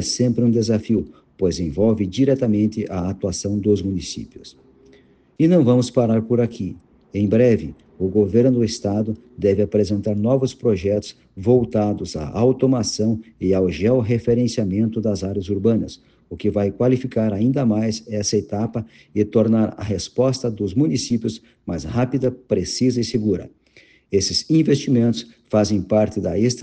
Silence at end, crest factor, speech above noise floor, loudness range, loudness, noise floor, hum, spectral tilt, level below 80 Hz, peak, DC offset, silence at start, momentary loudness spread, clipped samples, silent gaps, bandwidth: 0 s; 16 dB; 33 dB; 3 LU; -20 LUFS; -53 dBFS; none; -6.5 dB/octave; -48 dBFS; -4 dBFS; under 0.1%; 0 s; 9 LU; under 0.1%; none; 9.4 kHz